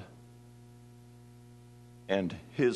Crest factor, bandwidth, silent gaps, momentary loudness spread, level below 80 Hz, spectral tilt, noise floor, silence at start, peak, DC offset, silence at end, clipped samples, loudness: 22 dB; 12 kHz; none; 22 LU; -68 dBFS; -6.5 dB/octave; -54 dBFS; 0 s; -14 dBFS; under 0.1%; 0 s; under 0.1%; -33 LUFS